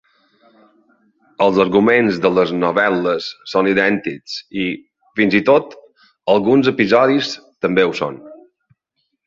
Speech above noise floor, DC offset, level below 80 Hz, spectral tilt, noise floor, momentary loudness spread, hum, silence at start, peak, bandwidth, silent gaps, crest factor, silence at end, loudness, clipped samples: 56 dB; under 0.1%; -56 dBFS; -6 dB/octave; -71 dBFS; 13 LU; none; 1.4 s; -2 dBFS; 7.6 kHz; none; 16 dB; 0.9 s; -16 LUFS; under 0.1%